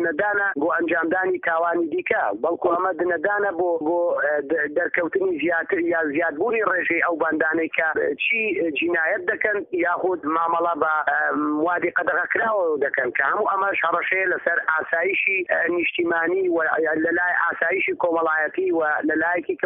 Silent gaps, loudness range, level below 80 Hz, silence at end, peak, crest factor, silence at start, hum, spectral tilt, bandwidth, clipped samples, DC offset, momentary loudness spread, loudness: none; 1 LU; -66 dBFS; 0 s; -6 dBFS; 16 dB; 0 s; none; 2.5 dB/octave; 3.8 kHz; under 0.1%; under 0.1%; 2 LU; -21 LUFS